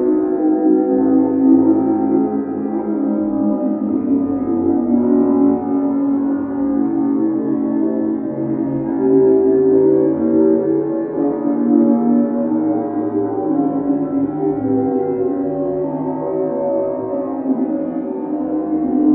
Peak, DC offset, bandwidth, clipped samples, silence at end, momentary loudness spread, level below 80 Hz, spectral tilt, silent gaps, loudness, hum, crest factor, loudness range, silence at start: -2 dBFS; under 0.1%; 2.4 kHz; under 0.1%; 0 s; 8 LU; -54 dBFS; -11.5 dB/octave; none; -17 LUFS; none; 14 dB; 4 LU; 0 s